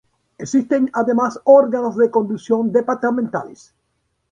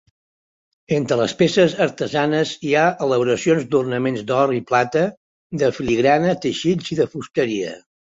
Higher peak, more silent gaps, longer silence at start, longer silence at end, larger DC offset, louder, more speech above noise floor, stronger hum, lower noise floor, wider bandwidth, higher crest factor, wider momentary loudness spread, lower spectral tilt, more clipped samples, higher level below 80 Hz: about the same, -2 dBFS vs -2 dBFS; second, none vs 5.17-5.50 s; second, 0.4 s vs 0.9 s; first, 0.75 s vs 0.35 s; neither; about the same, -17 LUFS vs -19 LUFS; second, 53 dB vs over 71 dB; neither; second, -70 dBFS vs under -90 dBFS; first, 9.4 kHz vs 8 kHz; about the same, 16 dB vs 16 dB; first, 12 LU vs 6 LU; about the same, -6.5 dB/octave vs -5.5 dB/octave; neither; second, -64 dBFS vs -54 dBFS